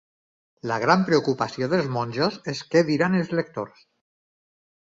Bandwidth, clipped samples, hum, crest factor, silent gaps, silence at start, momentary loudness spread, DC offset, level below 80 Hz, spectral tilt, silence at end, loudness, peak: 7.8 kHz; under 0.1%; none; 22 dB; none; 0.65 s; 12 LU; under 0.1%; -64 dBFS; -6 dB/octave; 1.2 s; -23 LUFS; -4 dBFS